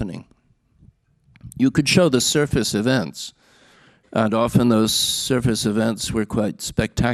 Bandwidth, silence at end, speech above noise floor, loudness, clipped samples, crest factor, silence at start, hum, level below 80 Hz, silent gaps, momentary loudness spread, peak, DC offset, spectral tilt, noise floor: 14.5 kHz; 0 s; 41 dB; -19 LUFS; under 0.1%; 18 dB; 0 s; none; -42 dBFS; none; 13 LU; -4 dBFS; under 0.1%; -4.5 dB/octave; -60 dBFS